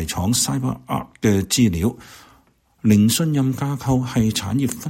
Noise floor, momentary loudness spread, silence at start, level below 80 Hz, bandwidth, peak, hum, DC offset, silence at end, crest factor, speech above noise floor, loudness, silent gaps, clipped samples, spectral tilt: -57 dBFS; 8 LU; 0 s; -42 dBFS; 16.5 kHz; -2 dBFS; none; under 0.1%; 0 s; 18 dB; 38 dB; -20 LUFS; none; under 0.1%; -5 dB/octave